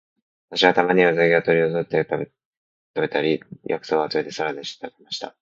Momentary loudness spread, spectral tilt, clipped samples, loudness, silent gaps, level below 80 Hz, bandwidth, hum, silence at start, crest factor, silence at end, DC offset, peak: 15 LU; -5.5 dB/octave; under 0.1%; -21 LUFS; 2.45-2.94 s; -66 dBFS; 7.6 kHz; none; 0.5 s; 22 dB; 0.1 s; under 0.1%; 0 dBFS